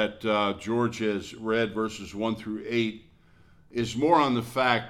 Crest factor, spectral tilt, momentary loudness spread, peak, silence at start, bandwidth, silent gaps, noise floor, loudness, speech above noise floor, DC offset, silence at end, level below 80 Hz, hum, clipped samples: 20 dB; -5.5 dB/octave; 10 LU; -8 dBFS; 0 s; 15.5 kHz; none; -57 dBFS; -27 LUFS; 30 dB; under 0.1%; 0 s; -58 dBFS; none; under 0.1%